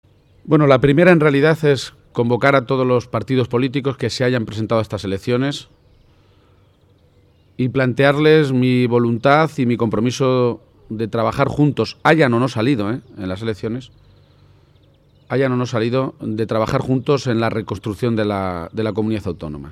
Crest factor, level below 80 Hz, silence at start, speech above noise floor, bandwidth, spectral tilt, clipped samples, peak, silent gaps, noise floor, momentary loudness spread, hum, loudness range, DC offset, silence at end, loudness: 18 dB; -48 dBFS; 0.45 s; 37 dB; 13 kHz; -7 dB/octave; under 0.1%; 0 dBFS; none; -54 dBFS; 11 LU; none; 8 LU; under 0.1%; 0 s; -18 LUFS